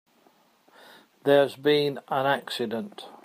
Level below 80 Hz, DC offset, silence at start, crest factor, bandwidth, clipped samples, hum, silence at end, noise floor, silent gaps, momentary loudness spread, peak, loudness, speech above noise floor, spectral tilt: -76 dBFS; under 0.1%; 1.25 s; 20 dB; 15.5 kHz; under 0.1%; none; 0.15 s; -62 dBFS; none; 10 LU; -6 dBFS; -25 LUFS; 37 dB; -5.5 dB/octave